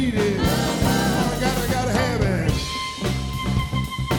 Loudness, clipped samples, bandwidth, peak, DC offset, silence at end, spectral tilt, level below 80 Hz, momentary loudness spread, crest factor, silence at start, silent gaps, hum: -22 LUFS; under 0.1%; 18 kHz; -6 dBFS; under 0.1%; 0 s; -5 dB/octave; -32 dBFS; 5 LU; 16 dB; 0 s; none; none